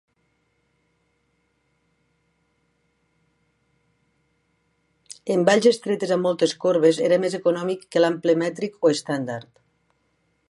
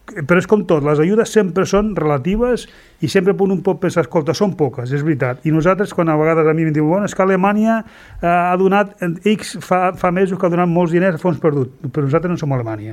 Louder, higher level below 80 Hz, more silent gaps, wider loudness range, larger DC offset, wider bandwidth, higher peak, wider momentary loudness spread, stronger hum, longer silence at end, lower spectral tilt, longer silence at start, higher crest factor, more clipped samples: second, -21 LUFS vs -16 LUFS; second, -74 dBFS vs -42 dBFS; neither; first, 5 LU vs 2 LU; neither; second, 11.5 kHz vs 14 kHz; about the same, -4 dBFS vs -2 dBFS; first, 10 LU vs 6 LU; neither; first, 1.1 s vs 0 s; second, -5 dB/octave vs -7 dB/octave; first, 5.25 s vs 0.1 s; first, 20 dB vs 14 dB; neither